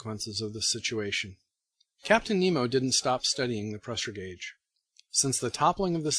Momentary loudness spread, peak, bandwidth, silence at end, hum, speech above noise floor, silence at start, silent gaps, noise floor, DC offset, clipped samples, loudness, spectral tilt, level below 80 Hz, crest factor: 14 LU; -8 dBFS; 14 kHz; 0 s; none; 46 dB; 0 s; none; -75 dBFS; under 0.1%; under 0.1%; -28 LUFS; -3 dB/octave; -58 dBFS; 22 dB